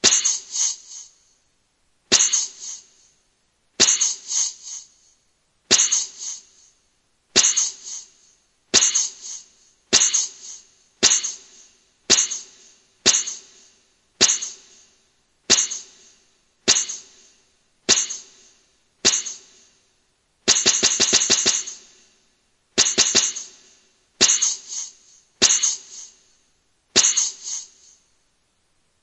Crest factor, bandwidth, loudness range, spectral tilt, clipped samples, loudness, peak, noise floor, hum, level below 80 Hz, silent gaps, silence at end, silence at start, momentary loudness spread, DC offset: 24 dB; 11.5 kHz; 4 LU; 1 dB/octave; under 0.1%; -18 LUFS; 0 dBFS; -66 dBFS; none; -70 dBFS; none; 1.4 s; 0.05 s; 19 LU; under 0.1%